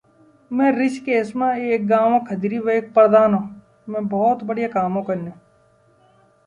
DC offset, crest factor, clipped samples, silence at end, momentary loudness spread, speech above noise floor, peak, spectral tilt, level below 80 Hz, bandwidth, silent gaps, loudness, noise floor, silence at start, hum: under 0.1%; 18 dB; under 0.1%; 1.15 s; 13 LU; 38 dB; -2 dBFS; -8 dB/octave; -62 dBFS; 10.5 kHz; none; -19 LUFS; -57 dBFS; 0.5 s; none